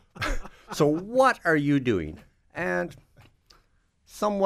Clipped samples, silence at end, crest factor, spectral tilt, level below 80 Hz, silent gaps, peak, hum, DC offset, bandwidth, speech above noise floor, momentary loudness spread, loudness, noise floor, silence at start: under 0.1%; 0 s; 20 dB; -6 dB/octave; -42 dBFS; none; -8 dBFS; none; under 0.1%; 15 kHz; 41 dB; 16 LU; -25 LUFS; -65 dBFS; 0.15 s